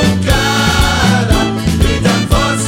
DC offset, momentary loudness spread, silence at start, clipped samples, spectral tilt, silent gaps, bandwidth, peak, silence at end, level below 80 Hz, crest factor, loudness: under 0.1%; 2 LU; 0 s; under 0.1%; -4.5 dB/octave; none; 17 kHz; 0 dBFS; 0 s; -20 dBFS; 12 dB; -12 LUFS